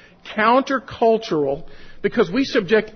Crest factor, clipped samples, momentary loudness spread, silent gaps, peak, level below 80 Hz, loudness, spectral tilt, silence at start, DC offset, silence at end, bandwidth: 16 dB; under 0.1%; 9 LU; none; -4 dBFS; -48 dBFS; -20 LUFS; -5.5 dB/octave; 0.25 s; under 0.1%; 0 s; 6.6 kHz